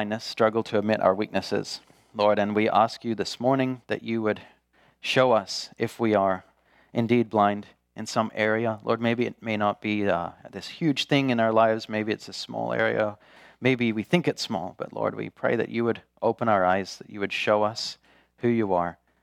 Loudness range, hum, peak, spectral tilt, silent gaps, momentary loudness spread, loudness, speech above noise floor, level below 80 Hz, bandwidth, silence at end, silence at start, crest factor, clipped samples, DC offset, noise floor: 2 LU; none; -4 dBFS; -5.5 dB/octave; none; 11 LU; -25 LUFS; 37 dB; -68 dBFS; 14.5 kHz; 0.3 s; 0 s; 22 dB; under 0.1%; under 0.1%; -63 dBFS